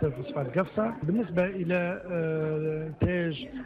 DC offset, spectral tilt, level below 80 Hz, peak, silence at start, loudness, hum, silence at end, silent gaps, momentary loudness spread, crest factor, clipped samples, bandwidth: under 0.1%; -9.5 dB/octave; -50 dBFS; -16 dBFS; 0 s; -29 LUFS; none; 0 s; none; 3 LU; 14 dB; under 0.1%; 5.4 kHz